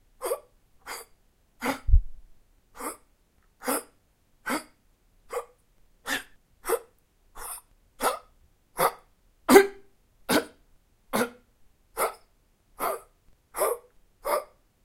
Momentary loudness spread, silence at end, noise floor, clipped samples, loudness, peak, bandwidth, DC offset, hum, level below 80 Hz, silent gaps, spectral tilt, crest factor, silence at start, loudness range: 15 LU; 0.4 s; -65 dBFS; under 0.1%; -29 LUFS; 0 dBFS; 16.5 kHz; under 0.1%; none; -38 dBFS; none; -4 dB/octave; 30 dB; 0.2 s; 11 LU